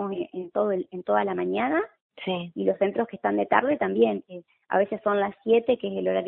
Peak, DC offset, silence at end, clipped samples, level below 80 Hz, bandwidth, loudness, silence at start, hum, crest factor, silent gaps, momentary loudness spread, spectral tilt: -4 dBFS; under 0.1%; 0 s; under 0.1%; -68 dBFS; 4 kHz; -26 LUFS; 0 s; none; 22 dB; 2.01-2.10 s; 9 LU; -10.5 dB/octave